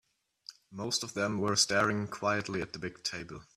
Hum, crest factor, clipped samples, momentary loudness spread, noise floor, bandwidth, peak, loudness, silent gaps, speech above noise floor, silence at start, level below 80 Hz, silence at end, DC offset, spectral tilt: none; 22 dB; under 0.1%; 21 LU; -55 dBFS; 15 kHz; -12 dBFS; -31 LUFS; none; 22 dB; 0.5 s; -66 dBFS; 0.15 s; under 0.1%; -3 dB/octave